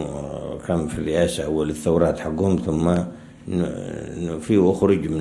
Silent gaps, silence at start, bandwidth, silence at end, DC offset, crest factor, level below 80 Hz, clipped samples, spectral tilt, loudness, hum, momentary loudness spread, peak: none; 0 s; 12 kHz; 0 s; under 0.1%; 18 dB; -44 dBFS; under 0.1%; -7 dB/octave; -22 LUFS; none; 12 LU; -4 dBFS